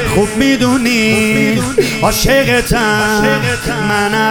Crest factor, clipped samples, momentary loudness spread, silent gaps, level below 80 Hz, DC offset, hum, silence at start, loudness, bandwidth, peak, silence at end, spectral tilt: 12 dB; under 0.1%; 3 LU; none; -28 dBFS; under 0.1%; none; 0 s; -12 LUFS; 18 kHz; 0 dBFS; 0 s; -4 dB/octave